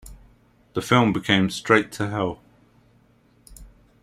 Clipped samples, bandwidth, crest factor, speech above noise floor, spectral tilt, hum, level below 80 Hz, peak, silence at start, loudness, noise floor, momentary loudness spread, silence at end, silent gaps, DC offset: under 0.1%; 15.5 kHz; 22 dB; 38 dB; -5.5 dB/octave; none; -52 dBFS; -2 dBFS; 0.05 s; -22 LUFS; -59 dBFS; 12 LU; 0.35 s; none; under 0.1%